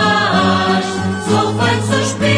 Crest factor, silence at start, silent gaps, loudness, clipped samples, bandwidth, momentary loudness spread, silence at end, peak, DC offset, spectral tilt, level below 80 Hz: 14 dB; 0 s; none; -15 LUFS; under 0.1%; 10.5 kHz; 4 LU; 0 s; -2 dBFS; under 0.1%; -5 dB/octave; -48 dBFS